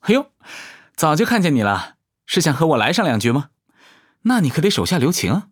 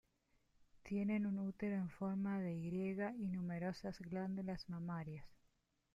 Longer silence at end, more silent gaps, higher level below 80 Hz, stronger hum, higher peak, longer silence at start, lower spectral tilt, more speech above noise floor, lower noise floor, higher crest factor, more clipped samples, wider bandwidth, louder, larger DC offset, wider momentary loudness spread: second, 0.1 s vs 0.6 s; neither; first, -56 dBFS vs -70 dBFS; neither; first, -2 dBFS vs -30 dBFS; second, 0.05 s vs 0.75 s; second, -5 dB/octave vs -8.5 dB/octave; about the same, 36 dB vs 37 dB; second, -53 dBFS vs -80 dBFS; about the same, 18 dB vs 14 dB; neither; first, over 20 kHz vs 7.6 kHz; first, -18 LUFS vs -44 LUFS; neither; first, 18 LU vs 7 LU